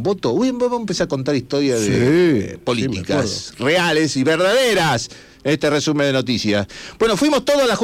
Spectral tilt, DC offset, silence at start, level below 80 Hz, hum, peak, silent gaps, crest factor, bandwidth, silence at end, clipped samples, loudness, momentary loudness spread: -4.5 dB/octave; under 0.1%; 0 s; -48 dBFS; none; -6 dBFS; none; 10 dB; 16.5 kHz; 0 s; under 0.1%; -18 LUFS; 7 LU